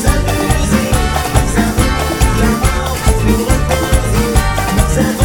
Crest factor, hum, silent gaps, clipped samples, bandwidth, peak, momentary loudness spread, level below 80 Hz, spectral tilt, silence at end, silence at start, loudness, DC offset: 12 dB; none; none; 0.2%; 19.5 kHz; 0 dBFS; 2 LU; -16 dBFS; -5 dB/octave; 0 s; 0 s; -14 LUFS; under 0.1%